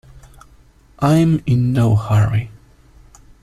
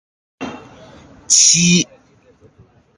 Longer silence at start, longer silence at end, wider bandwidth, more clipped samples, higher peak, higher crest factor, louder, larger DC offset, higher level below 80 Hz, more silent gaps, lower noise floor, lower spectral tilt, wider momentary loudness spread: second, 0.15 s vs 0.4 s; second, 0.9 s vs 1.15 s; first, 13 kHz vs 11.5 kHz; neither; about the same, -2 dBFS vs 0 dBFS; about the same, 16 dB vs 18 dB; second, -16 LUFS vs -11 LUFS; neither; first, -40 dBFS vs -54 dBFS; neither; about the same, -48 dBFS vs -51 dBFS; first, -8 dB/octave vs -2 dB/octave; second, 7 LU vs 22 LU